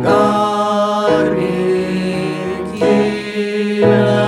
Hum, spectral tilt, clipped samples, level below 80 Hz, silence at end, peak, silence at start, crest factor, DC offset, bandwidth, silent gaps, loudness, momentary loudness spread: none; -6.5 dB/octave; under 0.1%; -48 dBFS; 0 s; 0 dBFS; 0 s; 14 dB; under 0.1%; 12.5 kHz; none; -15 LUFS; 7 LU